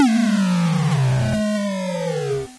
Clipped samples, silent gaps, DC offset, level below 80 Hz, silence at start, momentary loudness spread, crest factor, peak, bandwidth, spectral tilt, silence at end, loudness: under 0.1%; none; under 0.1%; -48 dBFS; 0 s; 6 LU; 10 dB; -8 dBFS; 11 kHz; -6.5 dB/octave; 0 s; -20 LUFS